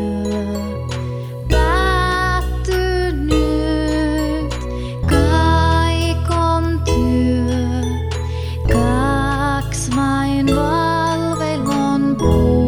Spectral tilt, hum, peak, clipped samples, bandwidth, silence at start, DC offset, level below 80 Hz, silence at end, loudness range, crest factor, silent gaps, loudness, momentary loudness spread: -6 dB/octave; none; -2 dBFS; under 0.1%; 15.5 kHz; 0 s; under 0.1%; -24 dBFS; 0 s; 2 LU; 14 dB; none; -18 LUFS; 8 LU